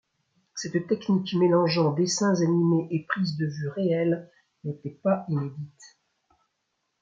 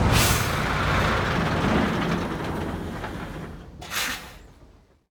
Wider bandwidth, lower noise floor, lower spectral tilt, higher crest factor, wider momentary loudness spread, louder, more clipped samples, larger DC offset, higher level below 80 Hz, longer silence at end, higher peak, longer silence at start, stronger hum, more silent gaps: second, 9 kHz vs over 20 kHz; first, -78 dBFS vs -53 dBFS; first, -6 dB/octave vs -4.5 dB/octave; about the same, 16 dB vs 18 dB; about the same, 14 LU vs 15 LU; about the same, -26 LUFS vs -25 LUFS; neither; neither; second, -72 dBFS vs -36 dBFS; first, 1.15 s vs 0.45 s; second, -10 dBFS vs -6 dBFS; first, 0.55 s vs 0 s; neither; neither